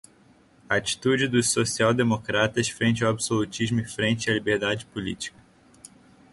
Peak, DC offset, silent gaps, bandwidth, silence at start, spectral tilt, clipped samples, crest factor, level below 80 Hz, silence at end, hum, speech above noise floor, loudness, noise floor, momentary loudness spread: -6 dBFS; under 0.1%; none; 11.5 kHz; 0.7 s; -4 dB/octave; under 0.1%; 20 dB; -56 dBFS; 1.05 s; none; 33 dB; -24 LUFS; -57 dBFS; 9 LU